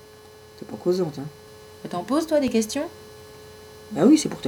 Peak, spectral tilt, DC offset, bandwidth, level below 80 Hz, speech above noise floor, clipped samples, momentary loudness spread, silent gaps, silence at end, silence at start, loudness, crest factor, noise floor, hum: -6 dBFS; -5 dB/octave; under 0.1%; 18 kHz; -60 dBFS; 25 dB; under 0.1%; 26 LU; none; 0 s; 0.55 s; -23 LUFS; 20 dB; -47 dBFS; none